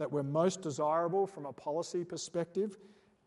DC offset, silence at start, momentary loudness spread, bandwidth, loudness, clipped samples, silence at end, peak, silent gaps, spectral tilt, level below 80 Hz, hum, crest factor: under 0.1%; 0 s; 7 LU; 11.5 kHz; -35 LUFS; under 0.1%; 0.4 s; -18 dBFS; none; -5.5 dB/octave; -80 dBFS; none; 18 dB